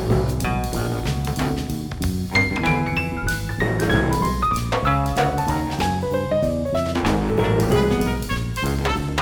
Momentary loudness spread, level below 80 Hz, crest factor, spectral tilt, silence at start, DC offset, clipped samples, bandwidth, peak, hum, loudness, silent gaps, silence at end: 6 LU; -30 dBFS; 16 dB; -6 dB/octave; 0 s; under 0.1%; under 0.1%; over 20 kHz; -4 dBFS; none; -22 LUFS; none; 0 s